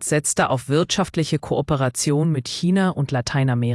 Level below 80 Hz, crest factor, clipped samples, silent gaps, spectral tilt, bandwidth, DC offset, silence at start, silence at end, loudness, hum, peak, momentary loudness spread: -48 dBFS; 14 dB; under 0.1%; none; -5 dB/octave; 12 kHz; under 0.1%; 0 s; 0 s; -21 LUFS; none; -6 dBFS; 3 LU